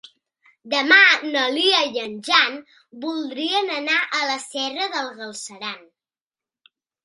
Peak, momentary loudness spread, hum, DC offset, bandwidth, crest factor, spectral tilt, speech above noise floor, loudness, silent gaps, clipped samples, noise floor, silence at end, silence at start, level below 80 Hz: 0 dBFS; 18 LU; none; under 0.1%; 11.5 kHz; 22 dB; -1 dB/octave; over 69 dB; -19 LUFS; none; under 0.1%; under -90 dBFS; 1.25 s; 0.65 s; -76 dBFS